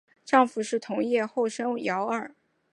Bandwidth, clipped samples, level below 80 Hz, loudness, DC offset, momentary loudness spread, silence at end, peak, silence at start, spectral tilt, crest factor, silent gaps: 11.5 kHz; under 0.1%; -82 dBFS; -27 LUFS; under 0.1%; 8 LU; 0.45 s; -6 dBFS; 0.25 s; -4.5 dB/octave; 22 dB; none